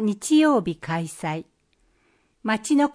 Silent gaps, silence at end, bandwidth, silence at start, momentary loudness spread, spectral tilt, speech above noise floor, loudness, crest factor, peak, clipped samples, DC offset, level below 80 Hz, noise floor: none; 0 s; 10.5 kHz; 0 s; 13 LU; -5 dB/octave; 43 dB; -23 LUFS; 14 dB; -8 dBFS; under 0.1%; under 0.1%; -62 dBFS; -65 dBFS